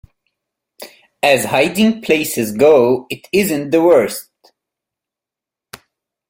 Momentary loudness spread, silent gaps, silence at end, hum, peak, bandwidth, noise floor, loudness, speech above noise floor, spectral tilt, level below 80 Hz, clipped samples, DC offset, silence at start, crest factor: 8 LU; none; 2.1 s; none; 0 dBFS; 16.5 kHz; -87 dBFS; -14 LUFS; 73 dB; -4.5 dB/octave; -54 dBFS; under 0.1%; under 0.1%; 0.8 s; 16 dB